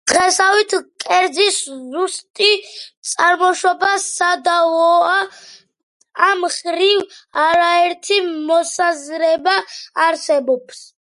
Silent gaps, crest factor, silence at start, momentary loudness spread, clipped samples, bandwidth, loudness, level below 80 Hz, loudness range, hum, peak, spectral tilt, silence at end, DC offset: 2.30-2.34 s, 2.97-3.02 s, 5.83-6.00 s; 16 dB; 0.05 s; 9 LU; under 0.1%; 11.5 kHz; -16 LUFS; -64 dBFS; 1 LU; none; 0 dBFS; 0 dB/octave; 0.25 s; under 0.1%